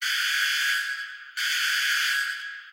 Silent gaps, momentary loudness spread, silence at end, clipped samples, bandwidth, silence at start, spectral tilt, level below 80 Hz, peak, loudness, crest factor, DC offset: none; 10 LU; 0 s; under 0.1%; 16 kHz; 0 s; 10.5 dB/octave; under -90 dBFS; -14 dBFS; -24 LUFS; 14 dB; under 0.1%